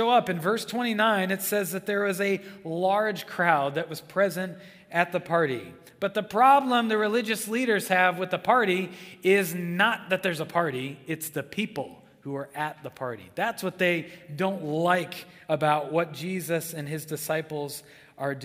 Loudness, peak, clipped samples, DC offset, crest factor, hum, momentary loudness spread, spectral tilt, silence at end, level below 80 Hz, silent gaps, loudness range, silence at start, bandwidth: -26 LUFS; -6 dBFS; under 0.1%; under 0.1%; 22 dB; none; 12 LU; -4.5 dB/octave; 0 s; -72 dBFS; none; 7 LU; 0 s; 16 kHz